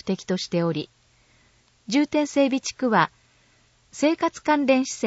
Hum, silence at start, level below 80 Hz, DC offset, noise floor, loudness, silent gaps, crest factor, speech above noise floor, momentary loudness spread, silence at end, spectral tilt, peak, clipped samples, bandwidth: none; 0.05 s; -64 dBFS; under 0.1%; -60 dBFS; -23 LUFS; none; 20 dB; 38 dB; 6 LU; 0 s; -5 dB/octave; -4 dBFS; under 0.1%; 8 kHz